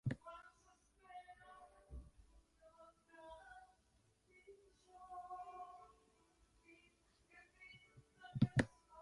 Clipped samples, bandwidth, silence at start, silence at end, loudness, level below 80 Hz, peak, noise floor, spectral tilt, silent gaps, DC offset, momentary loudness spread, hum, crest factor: under 0.1%; 11 kHz; 0.05 s; 0 s; -46 LUFS; -66 dBFS; -20 dBFS; -77 dBFS; -7 dB/octave; none; under 0.1%; 27 LU; none; 30 dB